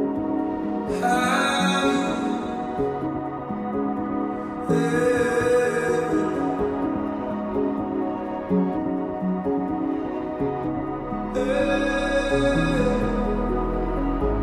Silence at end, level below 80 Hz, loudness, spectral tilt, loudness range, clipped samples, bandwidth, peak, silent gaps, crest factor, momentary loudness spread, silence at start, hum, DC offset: 0 s; -36 dBFS; -24 LUFS; -6 dB/octave; 3 LU; under 0.1%; 14 kHz; -10 dBFS; none; 14 dB; 7 LU; 0 s; none; under 0.1%